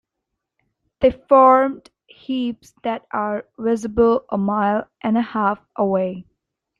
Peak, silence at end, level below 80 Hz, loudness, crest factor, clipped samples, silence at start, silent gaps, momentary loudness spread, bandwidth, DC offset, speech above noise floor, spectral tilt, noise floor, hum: -2 dBFS; 0.6 s; -50 dBFS; -19 LUFS; 18 dB; under 0.1%; 1 s; none; 14 LU; 10 kHz; under 0.1%; 61 dB; -7 dB/octave; -80 dBFS; none